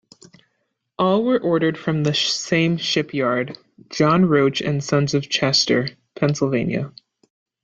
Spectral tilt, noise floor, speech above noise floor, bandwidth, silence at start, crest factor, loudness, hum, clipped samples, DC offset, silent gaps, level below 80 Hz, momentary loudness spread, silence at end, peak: -5 dB/octave; -73 dBFS; 54 dB; 8 kHz; 1 s; 16 dB; -19 LUFS; none; under 0.1%; under 0.1%; none; -58 dBFS; 8 LU; 0.75 s; -4 dBFS